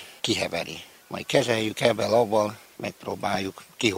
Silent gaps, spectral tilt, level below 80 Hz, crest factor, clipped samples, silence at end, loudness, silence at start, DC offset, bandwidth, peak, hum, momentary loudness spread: none; -4 dB/octave; -62 dBFS; 24 dB; under 0.1%; 0 s; -26 LUFS; 0 s; under 0.1%; 16 kHz; -2 dBFS; none; 14 LU